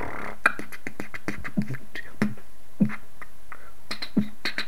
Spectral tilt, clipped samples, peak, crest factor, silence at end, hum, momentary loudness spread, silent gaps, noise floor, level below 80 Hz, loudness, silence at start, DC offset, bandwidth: -5.5 dB/octave; under 0.1%; -2 dBFS; 28 dB; 0 s; none; 21 LU; none; -49 dBFS; -54 dBFS; -30 LUFS; 0 s; 5%; 16 kHz